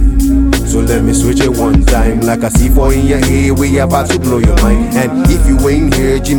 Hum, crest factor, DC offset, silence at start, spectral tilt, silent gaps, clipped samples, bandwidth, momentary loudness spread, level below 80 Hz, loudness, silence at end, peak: none; 10 dB; under 0.1%; 0 s; -6 dB/octave; none; under 0.1%; 17.5 kHz; 2 LU; -14 dBFS; -11 LUFS; 0 s; 0 dBFS